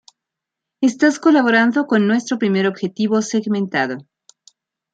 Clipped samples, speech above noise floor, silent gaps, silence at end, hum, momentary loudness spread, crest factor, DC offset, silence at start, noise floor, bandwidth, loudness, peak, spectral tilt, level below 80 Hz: under 0.1%; 67 dB; none; 0.9 s; none; 8 LU; 16 dB; under 0.1%; 0.8 s; -83 dBFS; 9.2 kHz; -17 LUFS; -2 dBFS; -5.5 dB/octave; -68 dBFS